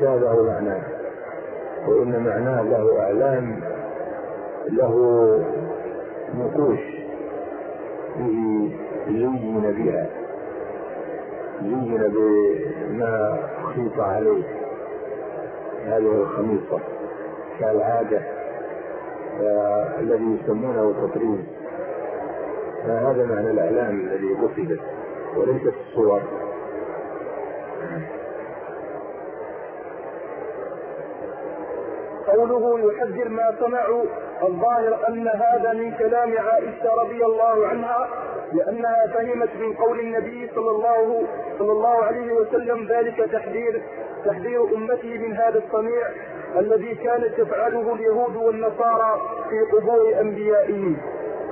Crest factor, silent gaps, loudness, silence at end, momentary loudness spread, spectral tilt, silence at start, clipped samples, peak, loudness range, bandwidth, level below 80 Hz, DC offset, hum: 16 dB; none; -23 LUFS; 0 s; 13 LU; -12.5 dB/octave; 0 s; under 0.1%; -8 dBFS; 5 LU; 3.2 kHz; -60 dBFS; under 0.1%; none